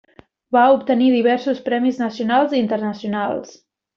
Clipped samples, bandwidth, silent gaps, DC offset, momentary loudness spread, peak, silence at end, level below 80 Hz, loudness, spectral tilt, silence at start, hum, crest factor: under 0.1%; 6.8 kHz; none; under 0.1%; 9 LU; -2 dBFS; 0.45 s; -64 dBFS; -18 LUFS; -4 dB/octave; 0.5 s; none; 16 dB